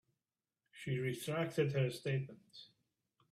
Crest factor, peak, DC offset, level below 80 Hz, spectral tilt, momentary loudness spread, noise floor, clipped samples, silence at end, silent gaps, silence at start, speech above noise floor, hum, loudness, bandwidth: 18 dB; -22 dBFS; under 0.1%; -76 dBFS; -6.5 dB/octave; 20 LU; under -90 dBFS; under 0.1%; 0.7 s; none; 0.75 s; over 52 dB; none; -39 LUFS; 14.5 kHz